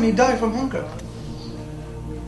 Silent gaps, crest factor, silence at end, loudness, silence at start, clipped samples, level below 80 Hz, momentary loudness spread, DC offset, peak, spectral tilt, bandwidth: none; 18 dB; 0 s; -25 LUFS; 0 s; under 0.1%; -38 dBFS; 16 LU; under 0.1%; -4 dBFS; -6 dB/octave; 12 kHz